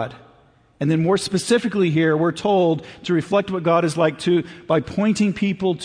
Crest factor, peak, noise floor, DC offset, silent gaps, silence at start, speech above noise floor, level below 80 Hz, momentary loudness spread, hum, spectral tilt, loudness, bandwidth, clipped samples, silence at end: 14 dB; -6 dBFS; -54 dBFS; under 0.1%; none; 0 s; 35 dB; -54 dBFS; 4 LU; none; -6 dB/octave; -20 LUFS; 10.5 kHz; under 0.1%; 0 s